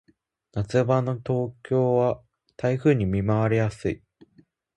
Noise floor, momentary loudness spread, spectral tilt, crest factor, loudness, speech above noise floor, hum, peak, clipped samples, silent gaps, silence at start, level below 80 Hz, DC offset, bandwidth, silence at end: -64 dBFS; 10 LU; -8.5 dB/octave; 18 dB; -24 LUFS; 41 dB; none; -8 dBFS; under 0.1%; none; 0.55 s; -48 dBFS; under 0.1%; 9.4 kHz; 0.8 s